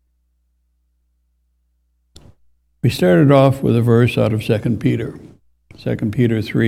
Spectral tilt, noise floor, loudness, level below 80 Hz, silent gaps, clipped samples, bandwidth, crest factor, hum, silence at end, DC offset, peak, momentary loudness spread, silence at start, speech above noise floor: -8 dB/octave; -64 dBFS; -16 LUFS; -48 dBFS; none; under 0.1%; 15 kHz; 18 dB; 60 Hz at -40 dBFS; 0 s; under 0.1%; 0 dBFS; 12 LU; 2.85 s; 49 dB